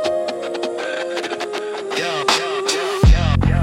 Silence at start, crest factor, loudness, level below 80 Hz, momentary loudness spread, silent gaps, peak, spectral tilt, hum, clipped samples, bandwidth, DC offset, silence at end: 0 s; 16 dB; -19 LUFS; -24 dBFS; 9 LU; none; -2 dBFS; -5 dB/octave; none; under 0.1%; 14.5 kHz; under 0.1%; 0 s